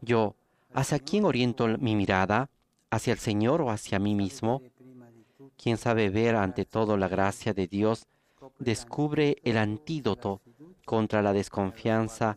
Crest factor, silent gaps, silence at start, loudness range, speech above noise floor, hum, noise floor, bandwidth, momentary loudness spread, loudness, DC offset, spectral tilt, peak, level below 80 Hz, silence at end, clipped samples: 20 dB; none; 0 s; 3 LU; 28 dB; none; -55 dBFS; 15 kHz; 7 LU; -28 LUFS; under 0.1%; -6 dB/octave; -8 dBFS; -58 dBFS; 0 s; under 0.1%